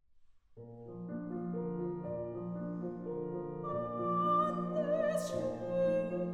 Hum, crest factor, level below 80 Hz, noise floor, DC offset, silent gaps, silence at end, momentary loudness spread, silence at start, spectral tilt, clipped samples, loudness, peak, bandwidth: none; 16 dB; -68 dBFS; -62 dBFS; under 0.1%; none; 0 s; 12 LU; 0.15 s; -7.5 dB/octave; under 0.1%; -36 LUFS; -20 dBFS; 13 kHz